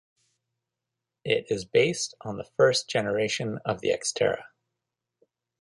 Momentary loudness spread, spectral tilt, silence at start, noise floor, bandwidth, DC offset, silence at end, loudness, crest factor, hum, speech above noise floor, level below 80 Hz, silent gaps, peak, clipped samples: 11 LU; -3.5 dB/octave; 1.25 s; -86 dBFS; 11.5 kHz; under 0.1%; 1.15 s; -26 LUFS; 22 dB; none; 60 dB; -64 dBFS; none; -8 dBFS; under 0.1%